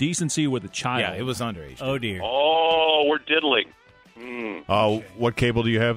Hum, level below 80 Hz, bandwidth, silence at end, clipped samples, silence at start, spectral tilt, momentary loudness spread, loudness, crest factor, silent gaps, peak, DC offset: none; -50 dBFS; 16 kHz; 0 s; under 0.1%; 0 s; -4.5 dB/octave; 13 LU; -23 LUFS; 18 dB; none; -6 dBFS; under 0.1%